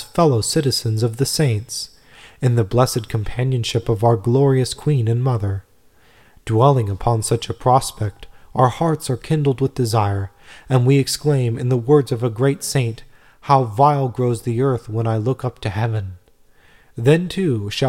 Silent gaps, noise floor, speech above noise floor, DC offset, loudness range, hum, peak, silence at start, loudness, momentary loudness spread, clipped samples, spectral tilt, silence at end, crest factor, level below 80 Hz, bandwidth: none; -54 dBFS; 36 dB; 0.1%; 2 LU; none; -2 dBFS; 0 s; -19 LUFS; 10 LU; under 0.1%; -6 dB/octave; 0 s; 18 dB; -44 dBFS; 16 kHz